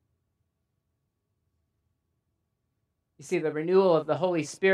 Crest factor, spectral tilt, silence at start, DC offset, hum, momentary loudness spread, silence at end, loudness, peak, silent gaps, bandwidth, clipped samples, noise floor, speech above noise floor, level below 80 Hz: 20 dB; -6 dB/octave; 3.2 s; under 0.1%; none; 8 LU; 0 s; -26 LUFS; -10 dBFS; none; 11.5 kHz; under 0.1%; -79 dBFS; 54 dB; -82 dBFS